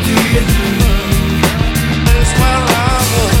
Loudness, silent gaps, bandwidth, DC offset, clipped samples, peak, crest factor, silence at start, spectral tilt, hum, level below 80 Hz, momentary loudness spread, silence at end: -12 LUFS; none; 17 kHz; under 0.1%; under 0.1%; 0 dBFS; 12 dB; 0 s; -4.5 dB/octave; none; -16 dBFS; 3 LU; 0 s